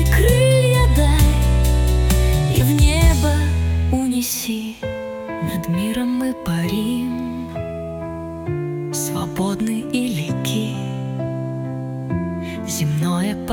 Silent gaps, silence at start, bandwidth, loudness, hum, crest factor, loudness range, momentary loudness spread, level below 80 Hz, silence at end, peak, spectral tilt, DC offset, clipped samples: none; 0 s; 18 kHz; -20 LUFS; none; 16 dB; 8 LU; 12 LU; -22 dBFS; 0 s; -2 dBFS; -5.5 dB/octave; under 0.1%; under 0.1%